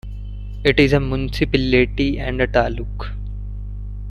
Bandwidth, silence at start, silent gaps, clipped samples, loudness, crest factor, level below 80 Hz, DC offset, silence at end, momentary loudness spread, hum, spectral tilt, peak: 12.5 kHz; 0.05 s; none; under 0.1%; -19 LUFS; 18 dB; -28 dBFS; under 0.1%; 0 s; 17 LU; 50 Hz at -25 dBFS; -7 dB/octave; -2 dBFS